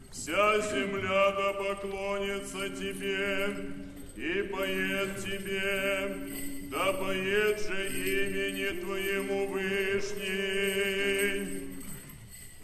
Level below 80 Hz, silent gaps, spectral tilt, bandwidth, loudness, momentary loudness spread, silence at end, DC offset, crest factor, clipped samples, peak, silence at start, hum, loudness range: -50 dBFS; none; -3.5 dB/octave; 13.5 kHz; -31 LUFS; 11 LU; 0 s; under 0.1%; 18 dB; under 0.1%; -12 dBFS; 0 s; none; 3 LU